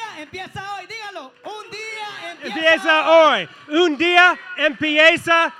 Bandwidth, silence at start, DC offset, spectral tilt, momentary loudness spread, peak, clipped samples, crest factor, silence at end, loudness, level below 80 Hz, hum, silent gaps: 12.5 kHz; 0 s; under 0.1%; -3 dB/octave; 20 LU; 0 dBFS; under 0.1%; 18 dB; 0.05 s; -15 LUFS; -66 dBFS; none; none